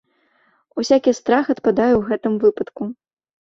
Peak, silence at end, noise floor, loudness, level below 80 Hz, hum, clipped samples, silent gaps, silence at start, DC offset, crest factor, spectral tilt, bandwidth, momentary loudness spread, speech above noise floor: -2 dBFS; 0.5 s; -61 dBFS; -18 LUFS; -52 dBFS; none; under 0.1%; none; 0.75 s; under 0.1%; 18 dB; -5.5 dB/octave; 7.6 kHz; 12 LU; 44 dB